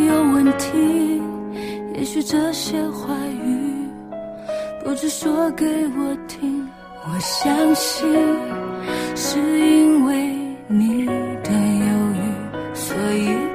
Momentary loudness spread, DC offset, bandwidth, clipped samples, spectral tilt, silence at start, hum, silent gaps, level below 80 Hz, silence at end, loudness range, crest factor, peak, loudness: 12 LU; under 0.1%; 15.5 kHz; under 0.1%; -4.5 dB/octave; 0 s; none; none; -52 dBFS; 0 s; 6 LU; 14 dB; -6 dBFS; -20 LUFS